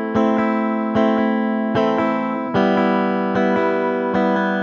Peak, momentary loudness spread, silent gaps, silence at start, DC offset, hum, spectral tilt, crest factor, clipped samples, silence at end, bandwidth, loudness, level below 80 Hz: -2 dBFS; 3 LU; none; 0 s; under 0.1%; none; -8 dB/octave; 16 dB; under 0.1%; 0 s; 6.8 kHz; -18 LUFS; -56 dBFS